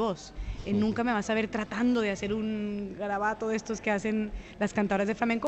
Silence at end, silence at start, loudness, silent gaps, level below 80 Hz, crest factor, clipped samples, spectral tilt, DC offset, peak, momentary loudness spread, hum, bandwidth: 0 s; 0 s; -30 LUFS; none; -48 dBFS; 16 dB; under 0.1%; -5.5 dB/octave; under 0.1%; -14 dBFS; 7 LU; none; 8.4 kHz